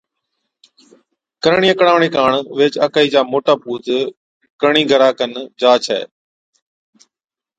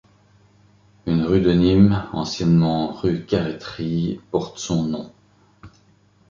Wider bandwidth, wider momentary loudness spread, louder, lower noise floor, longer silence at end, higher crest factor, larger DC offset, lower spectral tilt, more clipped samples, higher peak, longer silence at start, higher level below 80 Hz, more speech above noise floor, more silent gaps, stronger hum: first, 9.2 kHz vs 7.6 kHz; about the same, 10 LU vs 12 LU; first, -15 LUFS vs -20 LUFS; first, -89 dBFS vs -56 dBFS; first, 1.5 s vs 0.6 s; about the same, 16 dB vs 18 dB; neither; second, -4.5 dB/octave vs -7 dB/octave; neither; about the same, 0 dBFS vs -2 dBFS; first, 1.45 s vs 1.05 s; second, -60 dBFS vs -42 dBFS; first, 75 dB vs 37 dB; first, 4.17-4.40 s, 4.50-4.59 s vs none; second, none vs 50 Hz at -40 dBFS